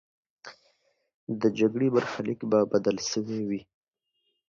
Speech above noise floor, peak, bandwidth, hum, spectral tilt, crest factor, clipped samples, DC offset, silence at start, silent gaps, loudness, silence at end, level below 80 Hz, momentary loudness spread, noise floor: 52 dB; -10 dBFS; 7.4 kHz; none; -5.5 dB/octave; 20 dB; under 0.1%; under 0.1%; 0.45 s; 1.14-1.27 s; -27 LUFS; 0.85 s; -68 dBFS; 22 LU; -78 dBFS